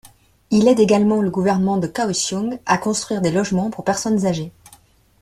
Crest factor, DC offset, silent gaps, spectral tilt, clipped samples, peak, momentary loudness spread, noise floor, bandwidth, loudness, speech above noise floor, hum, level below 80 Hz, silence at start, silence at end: 16 dB; under 0.1%; none; -5 dB/octave; under 0.1%; -2 dBFS; 7 LU; -51 dBFS; 13.5 kHz; -19 LUFS; 34 dB; none; -54 dBFS; 0.5 s; 0.7 s